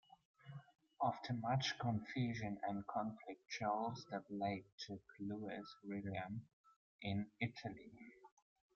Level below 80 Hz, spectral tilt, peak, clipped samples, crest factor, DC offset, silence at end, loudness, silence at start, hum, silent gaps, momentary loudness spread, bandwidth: -76 dBFS; -5 dB/octave; -26 dBFS; under 0.1%; 20 dB; under 0.1%; 0.5 s; -45 LUFS; 0.45 s; none; 4.72-4.78 s, 6.53-6.64 s, 6.76-6.99 s; 17 LU; 7.2 kHz